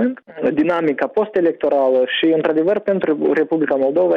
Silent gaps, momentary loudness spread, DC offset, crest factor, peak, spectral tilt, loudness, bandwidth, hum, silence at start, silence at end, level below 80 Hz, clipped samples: none; 3 LU; under 0.1%; 10 dB; -6 dBFS; -7.5 dB/octave; -17 LUFS; 5.4 kHz; none; 0 s; 0 s; -62 dBFS; under 0.1%